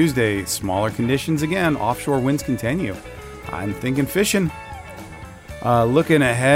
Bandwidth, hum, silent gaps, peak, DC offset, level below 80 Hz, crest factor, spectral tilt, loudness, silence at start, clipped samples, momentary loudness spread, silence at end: 16 kHz; none; none; -4 dBFS; under 0.1%; -44 dBFS; 16 dB; -5.5 dB/octave; -20 LUFS; 0 s; under 0.1%; 19 LU; 0 s